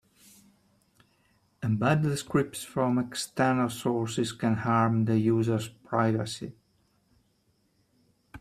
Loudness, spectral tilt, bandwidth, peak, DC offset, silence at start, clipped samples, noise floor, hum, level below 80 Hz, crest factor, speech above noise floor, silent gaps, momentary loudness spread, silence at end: -28 LUFS; -6 dB/octave; 15 kHz; -10 dBFS; under 0.1%; 1.6 s; under 0.1%; -70 dBFS; none; -64 dBFS; 20 dB; 43 dB; none; 8 LU; 0 s